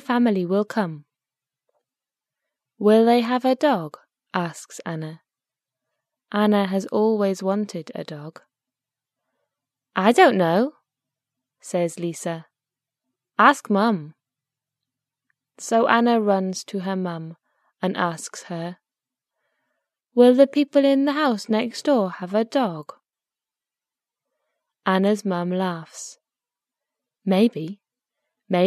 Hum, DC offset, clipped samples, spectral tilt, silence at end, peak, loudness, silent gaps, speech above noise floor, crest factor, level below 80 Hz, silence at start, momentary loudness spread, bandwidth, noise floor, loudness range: none; under 0.1%; under 0.1%; -5.5 dB/octave; 0 s; 0 dBFS; -21 LUFS; none; over 69 dB; 22 dB; -74 dBFS; 0.1 s; 18 LU; 14 kHz; under -90 dBFS; 6 LU